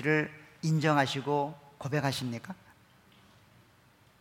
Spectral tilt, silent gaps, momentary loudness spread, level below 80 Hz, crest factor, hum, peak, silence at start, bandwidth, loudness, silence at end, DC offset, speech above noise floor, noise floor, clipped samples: -5.5 dB/octave; none; 15 LU; -72 dBFS; 22 dB; none; -12 dBFS; 0 s; 16.5 kHz; -31 LUFS; 1.65 s; under 0.1%; 33 dB; -62 dBFS; under 0.1%